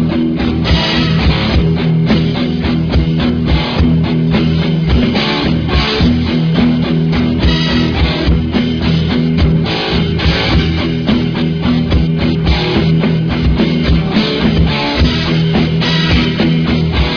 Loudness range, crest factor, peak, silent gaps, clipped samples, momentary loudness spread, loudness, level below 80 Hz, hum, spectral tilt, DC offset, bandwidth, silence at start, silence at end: 1 LU; 12 dB; 0 dBFS; none; under 0.1%; 2 LU; -13 LUFS; -20 dBFS; none; -7.5 dB/octave; under 0.1%; 5.4 kHz; 0 s; 0 s